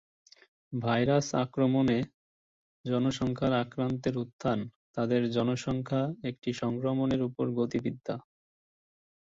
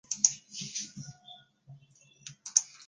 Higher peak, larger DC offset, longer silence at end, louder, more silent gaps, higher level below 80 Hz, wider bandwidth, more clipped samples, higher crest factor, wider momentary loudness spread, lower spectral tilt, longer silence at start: second, -14 dBFS vs -2 dBFS; neither; first, 1.05 s vs 0.05 s; about the same, -30 LUFS vs -30 LUFS; first, 2.14-2.84 s, 4.33-4.39 s, 4.76-4.94 s, 6.38-6.42 s vs none; first, -60 dBFS vs -78 dBFS; second, 7.8 kHz vs 10 kHz; neither; second, 16 dB vs 32 dB; second, 9 LU vs 23 LU; first, -6.5 dB/octave vs 0.5 dB/octave; first, 0.7 s vs 0.1 s